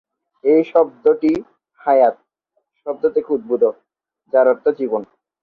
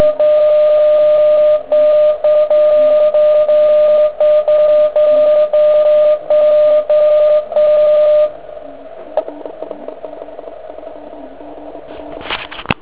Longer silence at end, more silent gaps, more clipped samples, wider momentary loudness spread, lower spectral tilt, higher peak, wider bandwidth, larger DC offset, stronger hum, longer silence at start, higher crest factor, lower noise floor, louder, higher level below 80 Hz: first, 0.4 s vs 0.1 s; neither; neither; second, 10 LU vs 21 LU; about the same, -8 dB/octave vs -8 dB/octave; about the same, -2 dBFS vs 0 dBFS; first, 5 kHz vs 4 kHz; second, under 0.1% vs 1%; neither; first, 0.45 s vs 0 s; about the same, 16 dB vs 12 dB; first, -70 dBFS vs -32 dBFS; second, -17 LUFS vs -11 LUFS; second, -64 dBFS vs -48 dBFS